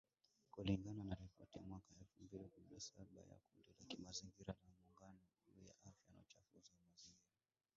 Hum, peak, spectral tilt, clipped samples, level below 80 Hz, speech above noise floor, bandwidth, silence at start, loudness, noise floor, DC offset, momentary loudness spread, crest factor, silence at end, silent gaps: none; -30 dBFS; -6 dB/octave; under 0.1%; -70 dBFS; 18 dB; 7.6 kHz; 0.55 s; -53 LUFS; -73 dBFS; under 0.1%; 22 LU; 26 dB; 0.55 s; none